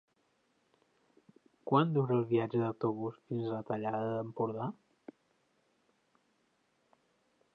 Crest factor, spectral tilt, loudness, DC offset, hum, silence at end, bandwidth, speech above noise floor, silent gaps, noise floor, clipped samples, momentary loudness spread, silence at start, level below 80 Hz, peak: 22 dB; -10 dB/octave; -34 LUFS; under 0.1%; none; 2.8 s; 5.2 kHz; 43 dB; none; -76 dBFS; under 0.1%; 11 LU; 1.65 s; -80 dBFS; -14 dBFS